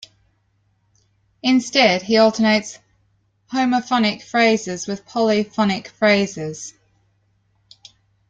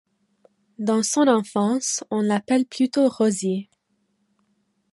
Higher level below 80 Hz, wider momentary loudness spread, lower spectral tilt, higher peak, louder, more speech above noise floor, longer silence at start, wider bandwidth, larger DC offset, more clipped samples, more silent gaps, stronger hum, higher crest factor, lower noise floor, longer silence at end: first, -62 dBFS vs -72 dBFS; first, 12 LU vs 7 LU; about the same, -4 dB/octave vs -4.5 dB/octave; first, 0 dBFS vs -4 dBFS; first, -18 LUFS vs -22 LUFS; about the same, 46 dB vs 49 dB; first, 1.45 s vs 0.8 s; second, 9 kHz vs 11.5 kHz; neither; neither; neither; neither; about the same, 20 dB vs 18 dB; second, -64 dBFS vs -70 dBFS; first, 1.6 s vs 1.3 s